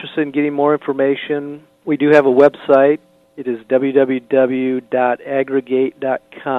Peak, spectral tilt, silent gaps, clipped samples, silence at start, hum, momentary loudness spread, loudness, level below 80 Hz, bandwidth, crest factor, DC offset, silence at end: 0 dBFS; -7.5 dB/octave; none; under 0.1%; 0 s; none; 12 LU; -16 LUFS; -66 dBFS; 6.2 kHz; 16 dB; under 0.1%; 0 s